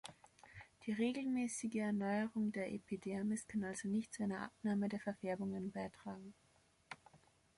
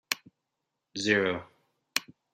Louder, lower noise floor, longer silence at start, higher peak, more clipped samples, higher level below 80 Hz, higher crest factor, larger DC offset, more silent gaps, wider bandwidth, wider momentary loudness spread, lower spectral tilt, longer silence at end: second, -42 LUFS vs -30 LUFS; second, -73 dBFS vs -84 dBFS; about the same, 0.05 s vs 0.1 s; second, -26 dBFS vs -4 dBFS; neither; about the same, -76 dBFS vs -74 dBFS; second, 16 dB vs 28 dB; neither; neither; second, 11.5 kHz vs 15.5 kHz; first, 17 LU vs 11 LU; first, -5.5 dB/octave vs -3 dB/octave; about the same, 0.4 s vs 0.3 s